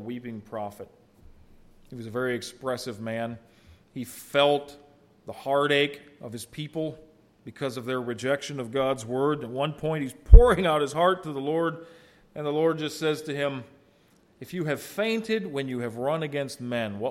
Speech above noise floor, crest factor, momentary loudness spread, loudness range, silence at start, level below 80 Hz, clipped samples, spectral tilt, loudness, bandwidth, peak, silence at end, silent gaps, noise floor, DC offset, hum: 36 dB; 26 dB; 17 LU; 9 LU; 0 s; -28 dBFS; under 0.1%; -6 dB/octave; -27 LUFS; 14 kHz; 0 dBFS; 0 s; none; -61 dBFS; under 0.1%; none